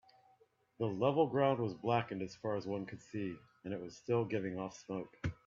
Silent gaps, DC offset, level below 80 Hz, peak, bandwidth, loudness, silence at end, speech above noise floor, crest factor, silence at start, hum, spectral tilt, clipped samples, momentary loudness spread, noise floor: none; under 0.1%; -68 dBFS; -18 dBFS; 7.6 kHz; -38 LUFS; 0.15 s; 35 dB; 20 dB; 0.8 s; none; -7 dB/octave; under 0.1%; 13 LU; -71 dBFS